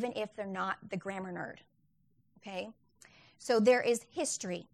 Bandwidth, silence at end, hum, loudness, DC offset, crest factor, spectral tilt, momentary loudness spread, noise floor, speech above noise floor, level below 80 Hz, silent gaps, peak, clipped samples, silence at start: 13.5 kHz; 0.1 s; none; -34 LUFS; under 0.1%; 20 dB; -4 dB/octave; 18 LU; -73 dBFS; 40 dB; -76 dBFS; none; -14 dBFS; under 0.1%; 0 s